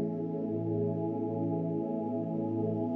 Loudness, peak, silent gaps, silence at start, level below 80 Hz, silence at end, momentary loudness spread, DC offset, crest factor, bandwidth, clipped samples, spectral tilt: -33 LUFS; -20 dBFS; none; 0 s; -74 dBFS; 0 s; 2 LU; under 0.1%; 12 dB; 3.3 kHz; under 0.1%; -13 dB/octave